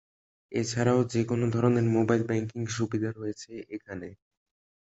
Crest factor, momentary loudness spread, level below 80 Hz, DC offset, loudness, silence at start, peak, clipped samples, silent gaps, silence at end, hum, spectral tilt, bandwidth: 18 dB; 16 LU; -60 dBFS; under 0.1%; -28 LUFS; 0.5 s; -10 dBFS; under 0.1%; none; 0.7 s; none; -6.5 dB/octave; 8.2 kHz